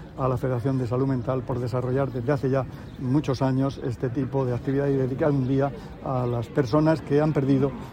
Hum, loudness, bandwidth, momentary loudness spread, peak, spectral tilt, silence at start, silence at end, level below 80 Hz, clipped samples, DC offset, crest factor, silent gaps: none; -25 LUFS; 9.4 kHz; 6 LU; -8 dBFS; -9 dB/octave; 0 s; 0 s; -46 dBFS; under 0.1%; under 0.1%; 16 dB; none